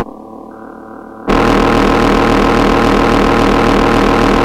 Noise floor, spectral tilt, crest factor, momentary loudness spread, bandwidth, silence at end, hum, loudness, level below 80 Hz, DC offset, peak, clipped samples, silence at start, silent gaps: -31 dBFS; -6 dB/octave; 12 dB; 21 LU; 16 kHz; 0 s; none; -10 LUFS; -22 dBFS; under 0.1%; 0 dBFS; under 0.1%; 0 s; none